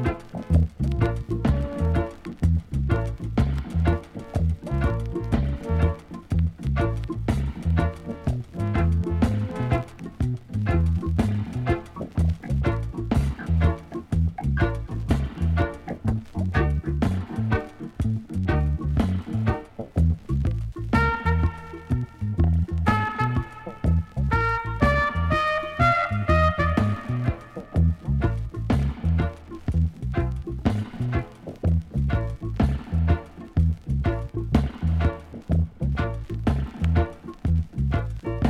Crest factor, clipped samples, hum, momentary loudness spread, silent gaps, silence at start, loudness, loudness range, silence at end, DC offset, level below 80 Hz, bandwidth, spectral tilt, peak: 18 dB; under 0.1%; none; 7 LU; none; 0 s; -25 LUFS; 3 LU; 0 s; under 0.1%; -30 dBFS; 10.5 kHz; -8.5 dB/octave; -6 dBFS